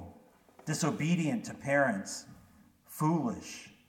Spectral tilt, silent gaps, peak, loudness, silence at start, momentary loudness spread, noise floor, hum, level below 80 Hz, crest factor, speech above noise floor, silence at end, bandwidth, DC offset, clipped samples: -5.5 dB/octave; none; -16 dBFS; -32 LUFS; 0 s; 17 LU; -61 dBFS; none; -70 dBFS; 18 dB; 29 dB; 0.2 s; 17 kHz; under 0.1%; under 0.1%